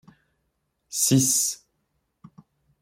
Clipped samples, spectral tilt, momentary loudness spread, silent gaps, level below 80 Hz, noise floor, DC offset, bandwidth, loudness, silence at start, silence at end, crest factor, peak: under 0.1%; -3.5 dB/octave; 15 LU; none; -66 dBFS; -75 dBFS; under 0.1%; 16.5 kHz; -21 LUFS; 0.9 s; 1.25 s; 20 dB; -8 dBFS